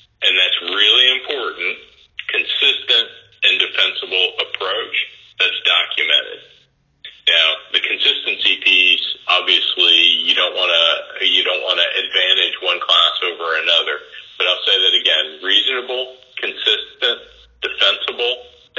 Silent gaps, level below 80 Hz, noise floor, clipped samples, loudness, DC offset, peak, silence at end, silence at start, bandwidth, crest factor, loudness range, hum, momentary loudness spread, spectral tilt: none; -64 dBFS; -56 dBFS; under 0.1%; -14 LUFS; under 0.1%; 0 dBFS; 0.3 s; 0.2 s; 7.4 kHz; 18 dB; 4 LU; none; 12 LU; 0 dB/octave